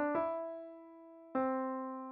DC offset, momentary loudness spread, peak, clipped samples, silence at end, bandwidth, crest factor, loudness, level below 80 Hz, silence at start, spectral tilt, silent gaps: under 0.1%; 19 LU; -24 dBFS; under 0.1%; 0 s; 4.5 kHz; 16 dB; -38 LUFS; -80 dBFS; 0 s; -5.5 dB/octave; none